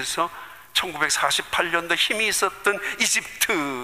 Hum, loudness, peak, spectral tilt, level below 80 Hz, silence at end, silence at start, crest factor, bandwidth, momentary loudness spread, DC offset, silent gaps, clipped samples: none; -22 LUFS; -6 dBFS; -0.5 dB/octave; -58 dBFS; 0 s; 0 s; 18 dB; 15.5 kHz; 6 LU; 0.2%; none; under 0.1%